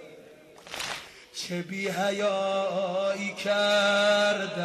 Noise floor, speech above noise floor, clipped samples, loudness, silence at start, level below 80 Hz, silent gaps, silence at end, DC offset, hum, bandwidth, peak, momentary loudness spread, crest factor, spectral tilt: -51 dBFS; 24 dB; under 0.1%; -26 LUFS; 0 s; -70 dBFS; none; 0 s; under 0.1%; none; 14 kHz; -12 dBFS; 14 LU; 14 dB; -3.5 dB/octave